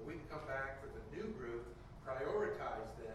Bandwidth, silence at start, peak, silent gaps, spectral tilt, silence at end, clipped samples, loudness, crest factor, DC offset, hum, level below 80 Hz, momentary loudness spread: 13 kHz; 0 s; -28 dBFS; none; -6.5 dB/octave; 0 s; under 0.1%; -45 LUFS; 16 dB; under 0.1%; none; -58 dBFS; 11 LU